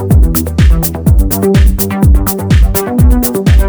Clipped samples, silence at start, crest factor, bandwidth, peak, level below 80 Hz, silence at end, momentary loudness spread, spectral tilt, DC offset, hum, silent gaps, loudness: 0.2%; 0 s; 8 dB; over 20 kHz; 0 dBFS; -10 dBFS; 0 s; 2 LU; -6.5 dB/octave; under 0.1%; none; none; -10 LUFS